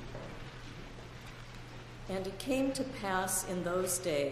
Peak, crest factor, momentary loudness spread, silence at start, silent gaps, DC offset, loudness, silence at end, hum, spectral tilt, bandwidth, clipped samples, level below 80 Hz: -20 dBFS; 18 dB; 16 LU; 0 s; none; under 0.1%; -35 LUFS; 0 s; none; -4 dB/octave; 15.5 kHz; under 0.1%; -52 dBFS